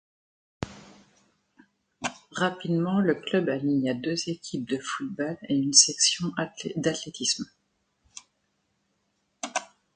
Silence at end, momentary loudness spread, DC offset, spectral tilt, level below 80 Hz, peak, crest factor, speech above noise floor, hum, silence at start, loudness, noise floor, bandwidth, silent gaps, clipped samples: 0.3 s; 20 LU; under 0.1%; -3 dB/octave; -64 dBFS; -2 dBFS; 26 dB; 48 dB; none; 0.6 s; -26 LUFS; -74 dBFS; 10 kHz; none; under 0.1%